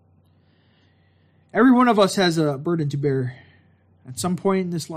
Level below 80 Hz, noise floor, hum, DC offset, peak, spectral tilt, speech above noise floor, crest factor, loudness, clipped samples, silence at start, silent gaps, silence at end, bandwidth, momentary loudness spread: -62 dBFS; -59 dBFS; none; under 0.1%; -4 dBFS; -6 dB/octave; 39 dB; 18 dB; -20 LUFS; under 0.1%; 1.55 s; none; 0 s; 15.5 kHz; 12 LU